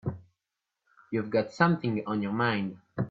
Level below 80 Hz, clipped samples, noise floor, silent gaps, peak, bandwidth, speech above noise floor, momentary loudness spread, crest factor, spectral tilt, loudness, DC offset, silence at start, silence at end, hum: -66 dBFS; under 0.1%; -87 dBFS; none; -10 dBFS; 7.6 kHz; 58 dB; 11 LU; 22 dB; -7.5 dB/octave; -29 LUFS; under 0.1%; 0.05 s; 0 s; none